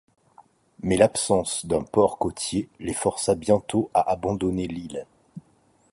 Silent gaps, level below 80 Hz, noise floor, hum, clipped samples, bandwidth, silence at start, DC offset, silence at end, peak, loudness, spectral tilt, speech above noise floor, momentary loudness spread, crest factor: none; -50 dBFS; -62 dBFS; none; under 0.1%; 11.5 kHz; 0.85 s; under 0.1%; 0.55 s; -4 dBFS; -24 LUFS; -5 dB/octave; 38 dB; 12 LU; 22 dB